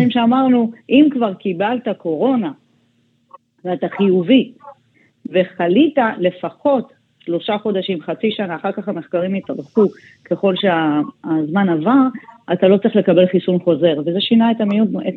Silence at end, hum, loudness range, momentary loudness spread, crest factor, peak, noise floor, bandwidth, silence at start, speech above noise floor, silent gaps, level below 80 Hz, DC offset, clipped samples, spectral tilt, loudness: 0 s; none; 5 LU; 10 LU; 14 dB; -2 dBFS; -60 dBFS; 4.4 kHz; 0 s; 44 dB; none; -68 dBFS; under 0.1%; under 0.1%; -9 dB/octave; -17 LUFS